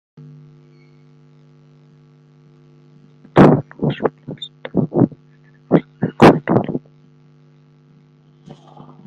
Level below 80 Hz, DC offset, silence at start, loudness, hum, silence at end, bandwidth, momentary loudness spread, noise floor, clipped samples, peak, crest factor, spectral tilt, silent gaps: -50 dBFS; under 0.1%; 3.35 s; -16 LUFS; none; 2.3 s; 9.6 kHz; 17 LU; -50 dBFS; under 0.1%; 0 dBFS; 20 dB; -8 dB/octave; none